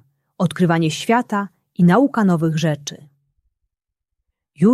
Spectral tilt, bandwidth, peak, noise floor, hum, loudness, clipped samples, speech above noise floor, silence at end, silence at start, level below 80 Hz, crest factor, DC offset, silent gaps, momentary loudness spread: -6.5 dB/octave; 13 kHz; -2 dBFS; -82 dBFS; none; -18 LUFS; under 0.1%; 65 dB; 0 s; 0.4 s; -62 dBFS; 16 dB; under 0.1%; none; 11 LU